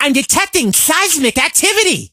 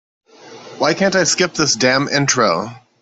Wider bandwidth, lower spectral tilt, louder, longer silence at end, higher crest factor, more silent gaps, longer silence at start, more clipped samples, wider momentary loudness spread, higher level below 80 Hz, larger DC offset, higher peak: first, over 20 kHz vs 8.4 kHz; second, -1.5 dB/octave vs -3 dB/octave; first, -11 LUFS vs -15 LUFS; second, 0.05 s vs 0.25 s; about the same, 14 dB vs 16 dB; neither; second, 0 s vs 0.45 s; neither; second, 2 LU vs 6 LU; first, -44 dBFS vs -56 dBFS; neither; about the same, 0 dBFS vs -2 dBFS